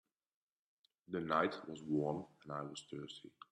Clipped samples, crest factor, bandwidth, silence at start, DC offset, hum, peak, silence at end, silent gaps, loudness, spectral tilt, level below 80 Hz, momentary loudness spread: under 0.1%; 24 dB; 11 kHz; 1.1 s; under 0.1%; none; -20 dBFS; 0.25 s; none; -41 LUFS; -6 dB/octave; -80 dBFS; 13 LU